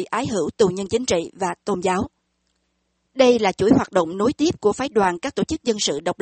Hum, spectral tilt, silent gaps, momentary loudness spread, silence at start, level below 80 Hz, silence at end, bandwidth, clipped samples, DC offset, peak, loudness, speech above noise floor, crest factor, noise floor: none; -4.5 dB/octave; none; 8 LU; 0 s; -50 dBFS; 0.1 s; 8.8 kHz; under 0.1%; under 0.1%; -4 dBFS; -21 LUFS; 51 dB; 18 dB; -71 dBFS